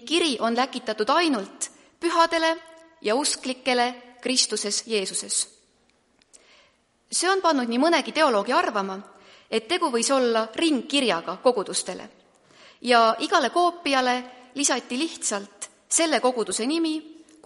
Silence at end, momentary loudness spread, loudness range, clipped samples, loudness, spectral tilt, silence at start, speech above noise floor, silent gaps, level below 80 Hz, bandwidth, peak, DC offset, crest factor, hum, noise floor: 0.3 s; 11 LU; 3 LU; under 0.1%; -23 LUFS; -1.5 dB/octave; 0 s; 41 dB; none; -72 dBFS; 11.5 kHz; -4 dBFS; under 0.1%; 20 dB; none; -64 dBFS